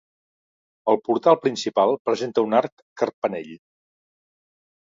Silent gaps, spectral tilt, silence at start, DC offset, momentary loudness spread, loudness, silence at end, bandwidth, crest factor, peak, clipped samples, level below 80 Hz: 1.99-2.05 s, 2.72-2.96 s, 3.13-3.22 s; -5 dB/octave; 0.85 s; under 0.1%; 11 LU; -22 LUFS; 1.3 s; 7.6 kHz; 22 dB; -2 dBFS; under 0.1%; -74 dBFS